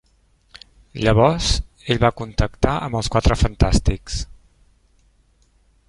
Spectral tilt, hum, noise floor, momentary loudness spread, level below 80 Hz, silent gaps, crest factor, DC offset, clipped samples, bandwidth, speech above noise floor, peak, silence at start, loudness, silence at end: -5.5 dB/octave; none; -59 dBFS; 12 LU; -28 dBFS; none; 20 dB; under 0.1%; under 0.1%; 11.5 kHz; 41 dB; 0 dBFS; 0.95 s; -20 LUFS; 1.65 s